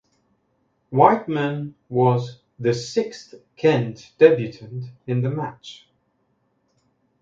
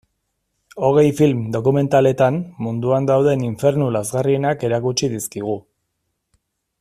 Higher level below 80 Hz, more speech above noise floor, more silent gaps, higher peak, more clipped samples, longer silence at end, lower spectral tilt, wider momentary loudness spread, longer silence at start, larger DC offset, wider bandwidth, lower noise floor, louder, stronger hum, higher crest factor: second, -64 dBFS vs -54 dBFS; second, 47 dB vs 56 dB; neither; about the same, 0 dBFS vs -2 dBFS; neither; first, 1.5 s vs 1.2 s; about the same, -7 dB/octave vs -6.5 dB/octave; first, 18 LU vs 9 LU; first, 0.9 s vs 0.75 s; neither; second, 7.6 kHz vs 14.5 kHz; second, -68 dBFS vs -74 dBFS; second, -21 LUFS vs -18 LUFS; neither; first, 22 dB vs 16 dB